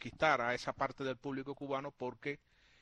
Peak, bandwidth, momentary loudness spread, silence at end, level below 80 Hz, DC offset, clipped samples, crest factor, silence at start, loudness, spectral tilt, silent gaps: -16 dBFS; 10 kHz; 12 LU; 0.45 s; -66 dBFS; under 0.1%; under 0.1%; 22 dB; 0 s; -38 LUFS; -5 dB/octave; none